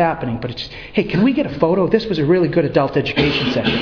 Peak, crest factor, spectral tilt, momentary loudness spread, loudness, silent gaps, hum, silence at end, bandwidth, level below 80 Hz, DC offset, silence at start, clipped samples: 0 dBFS; 16 dB; -7.5 dB/octave; 8 LU; -17 LUFS; none; none; 0 s; 5.4 kHz; -40 dBFS; under 0.1%; 0 s; under 0.1%